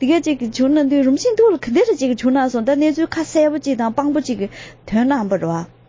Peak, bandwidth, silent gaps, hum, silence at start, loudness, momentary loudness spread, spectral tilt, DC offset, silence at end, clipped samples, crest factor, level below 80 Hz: -4 dBFS; 7.6 kHz; none; none; 0 s; -17 LUFS; 7 LU; -5.5 dB/octave; under 0.1%; 0.25 s; under 0.1%; 12 dB; -50 dBFS